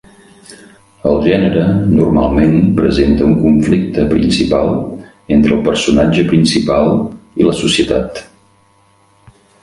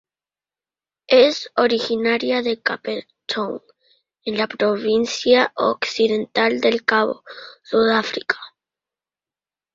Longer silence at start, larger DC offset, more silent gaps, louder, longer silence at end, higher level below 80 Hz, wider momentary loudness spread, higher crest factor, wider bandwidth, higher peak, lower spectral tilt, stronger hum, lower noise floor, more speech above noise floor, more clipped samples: second, 0.5 s vs 1.1 s; neither; neither; first, -12 LUFS vs -19 LUFS; first, 1.4 s vs 1.25 s; first, -30 dBFS vs -64 dBFS; second, 7 LU vs 12 LU; second, 12 dB vs 18 dB; first, 11.5 kHz vs 7.6 kHz; about the same, 0 dBFS vs -2 dBFS; first, -6.5 dB/octave vs -3.5 dB/octave; neither; second, -51 dBFS vs under -90 dBFS; second, 40 dB vs over 71 dB; neither